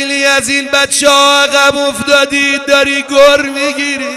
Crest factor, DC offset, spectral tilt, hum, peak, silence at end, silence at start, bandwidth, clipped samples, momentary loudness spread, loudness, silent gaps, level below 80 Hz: 10 dB; under 0.1%; -1 dB/octave; none; 0 dBFS; 0 s; 0 s; 15 kHz; 0.4%; 7 LU; -9 LUFS; none; -44 dBFS